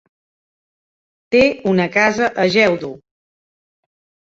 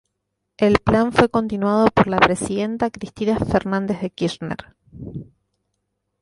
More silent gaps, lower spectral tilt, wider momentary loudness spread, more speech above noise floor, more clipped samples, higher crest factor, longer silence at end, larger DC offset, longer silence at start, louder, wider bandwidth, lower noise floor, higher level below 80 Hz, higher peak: neither; about the same, -5.5 dB/octave vs -6 dB/octave; second, 5 LU vs 17 LU; first, over 75 dB vs 57 dB; neither; about the same, 18 dB vs 20 dB; first, 1.25 s vs 1 s; neither; first, 1.3 s vs 0.6 s; first, -15 LUFS vs -19 LUFS; second, 7.8 kHz vs 11.5 kHz; first, under -90 dBFS vs -77 dBFS; second, -54 dBFS vs -42 dBFS; about the same, -2 dBFS vs 0 dBFS